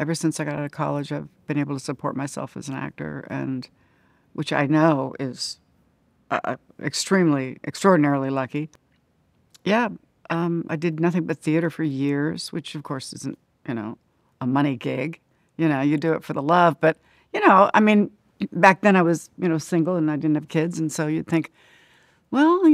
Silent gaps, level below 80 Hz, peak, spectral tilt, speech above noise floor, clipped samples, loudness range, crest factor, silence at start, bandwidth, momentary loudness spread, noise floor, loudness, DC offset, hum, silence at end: none; -68 dBFS; -2 dBFS; -6 dB/octave; 42 dB; under 0.1%; 9 LU; 22 dB; 0 s; 14.5 kHz; 15 LU; -64 dBFS; -23 LUFS; under 0.1%; none; 0 s